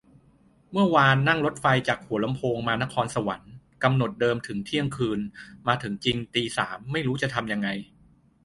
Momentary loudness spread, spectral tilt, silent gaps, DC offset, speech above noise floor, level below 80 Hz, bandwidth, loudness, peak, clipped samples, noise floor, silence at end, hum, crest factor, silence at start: 10 LU; -5.5 dB/octave; none; under 0.1%; 34 dB; -56 dBFS; 11.5 kHz; -25 LUFS; -4 dBFS; under 0.1%; -59 dBFS; 0.6 s; none; 22 dB; 0.7 s